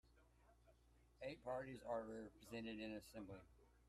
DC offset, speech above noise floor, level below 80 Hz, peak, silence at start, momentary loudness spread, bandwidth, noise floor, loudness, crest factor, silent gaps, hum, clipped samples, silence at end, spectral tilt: under 0.1%; 22 dB; -74 dBFS; -36 dBFS; 0.05 s; 8 LU; 13 kHz; -74 dBFS; -52 LUFS; 18 dB; none; none; under 0.1%; 0 s; -5.5 dB/octave